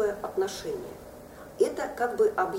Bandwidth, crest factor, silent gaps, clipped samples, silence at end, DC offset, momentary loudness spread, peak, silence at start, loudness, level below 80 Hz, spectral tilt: 16 kHz; 18 dB; none; under 0.1%; 0 s; under 0.1%; 20 LU; -12 dBFS; 0 s; -29 LUFS; -58 dBFS; -4 dB/octave